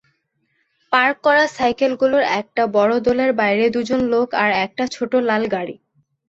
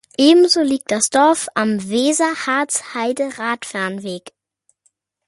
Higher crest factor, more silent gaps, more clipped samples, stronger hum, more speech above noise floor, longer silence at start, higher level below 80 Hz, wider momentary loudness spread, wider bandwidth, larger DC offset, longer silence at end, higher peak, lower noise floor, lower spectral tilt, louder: about the same, 16 dB vs 16 dB; neither; neither; neither; about the same, 50 dB vs 48 dB; first, 0.9 s vs 0.2 s; first, -56 dBFS vs -64 dBFS; second, 5 LU vs 11 LU; second, 8 kHz vs 11.5 kHz; neither; second, 0.55 s vs 1 s; about the same, -2 dBFS vs -2 dBFS; about the same, -68 dBFS vs -65 dBFS; first, -5 dB/octave vs -3 dB/octave; about the same, -18 LUFS vs -17 LUFS